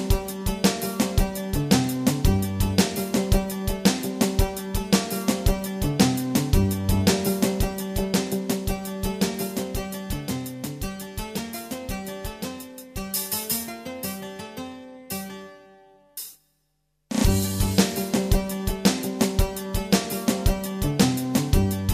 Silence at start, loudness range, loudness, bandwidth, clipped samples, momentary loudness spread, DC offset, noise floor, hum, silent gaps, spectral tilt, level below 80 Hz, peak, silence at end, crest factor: 0 s; 8 LU; -25 LUFS; 15.5 kHz; under 0.1%; 12 LU; under 0.1%; -72 dBFS; none; none; -5 dB/octave; -32 dBFS; -4 dBFS; 0 s; 22 dB